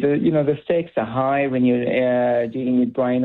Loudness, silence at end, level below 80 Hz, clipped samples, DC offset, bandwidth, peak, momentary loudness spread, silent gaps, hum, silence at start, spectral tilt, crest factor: -20 LUFS; 0 s; -58 dBFS; under 0.1%; under 0.1%; 4.1 kHz; -8 dBFS; 3 LU; none; none; 0 s; -10.5 dB/octave; 10 dB